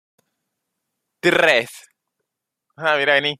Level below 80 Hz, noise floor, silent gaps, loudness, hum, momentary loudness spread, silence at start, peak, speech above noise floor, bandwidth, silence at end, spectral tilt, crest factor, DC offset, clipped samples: -64 dBFS; -80 dBFS; none; -17 LUFS; none; 9 LU; 1.25 s; -2 dBFS; 62 dB; 15 kHz; 0.05 s; -3.5 dB/octave; 20 dB; under 0.1%; under 0.1%